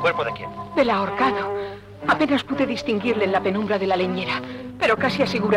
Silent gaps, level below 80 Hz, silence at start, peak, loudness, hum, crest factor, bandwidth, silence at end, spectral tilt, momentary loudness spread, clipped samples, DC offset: none; -52 dBFS; 0 s; -6 dBFS; -22 LUFS; none; 16 dB; 13.5 kHz; 0 s; -6 dB/octave; 8 LU; under 0.1%; under 0.1%